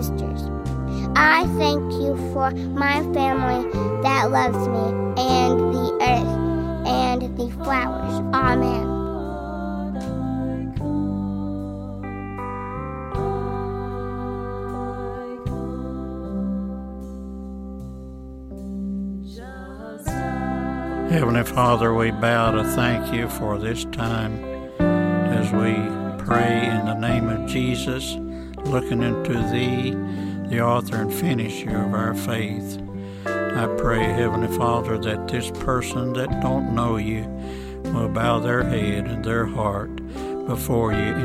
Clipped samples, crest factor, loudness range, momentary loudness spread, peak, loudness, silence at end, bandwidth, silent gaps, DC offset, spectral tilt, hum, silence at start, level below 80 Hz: under 0.1%; 20 dB; 9 LU; 12 LU; -4 dBFS; -23 LUFS; 0 s; 16 kHz; none; under 0.1%; -6.5 dB/octave; none; 0 s; -36 dBFS